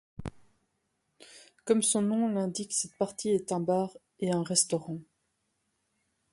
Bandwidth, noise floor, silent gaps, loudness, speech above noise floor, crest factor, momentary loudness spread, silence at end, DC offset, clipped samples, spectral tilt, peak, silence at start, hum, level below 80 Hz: 11.5 kHz; -78 dBFS; none; -29 LUFS; 49 dB; 22 dB; 17 LU; 1.3 s; under 0.1%; under 0.1%; -4 dB/octave; -10 dBFS; 0.2 s; none; -62 dBFS